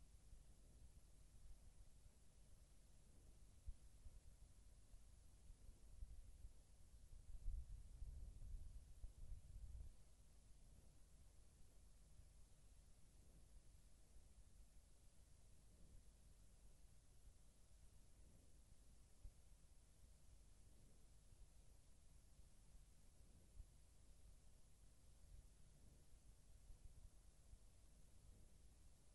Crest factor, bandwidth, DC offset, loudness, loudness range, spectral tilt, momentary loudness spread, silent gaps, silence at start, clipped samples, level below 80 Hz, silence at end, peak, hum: 24 dB; 11.5 kHz; under 0.1%; -64 LUFS; 8 LU; -5 dB/octave; 10 LU; none; 0 s; under 0.1%; -64 dBFS; 0 s; -38 dBFS; none